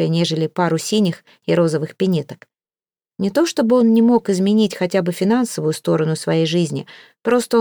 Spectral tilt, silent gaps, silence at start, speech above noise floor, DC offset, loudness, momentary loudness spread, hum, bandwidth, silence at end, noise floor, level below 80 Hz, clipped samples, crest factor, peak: -6 dB/octave; none; 0 s; over 73 dB; under 0.1%; -18 LUFS; 8 LU; none; over 20 kHz; 0 s; under -90 dBFS; -66 dBFS; under 0.1%; 14 dB; -4 dBFS